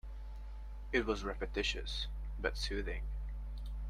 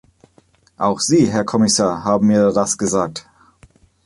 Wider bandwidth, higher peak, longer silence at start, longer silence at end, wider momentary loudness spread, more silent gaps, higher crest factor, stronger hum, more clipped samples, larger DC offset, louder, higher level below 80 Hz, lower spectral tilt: about the same, 11 kHz vs 11.5 kHz; second, -18 dBFS vs -2 dBFS; second, 0.05 s vs 0.8 s; second, 0 s vs 0.85 s; first, 14 LU vs 7 LU; neither; first, 22 dB vs 16 dB; first, 50 Hz at -40 dBFS vs none; neither; neither; second, -40 LUFS vs -16 LUFS; first, -42 dBFS vs -50 dBFS; about the same, -4.5 dB/octave vs -4.5 dB/octave